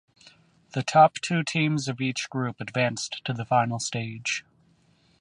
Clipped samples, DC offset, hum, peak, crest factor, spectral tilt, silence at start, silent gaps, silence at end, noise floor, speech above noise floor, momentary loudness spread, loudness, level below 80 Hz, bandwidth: under 0.1%; under 0.1%; none; -6 dBFS; 22 dB; -4.5 dB/octave; 0.75 s; none; 0.8 s; -63 dBFS; 37 dB; 12 LU; -26 LUFS; -68 dBFS; 11.5 kHz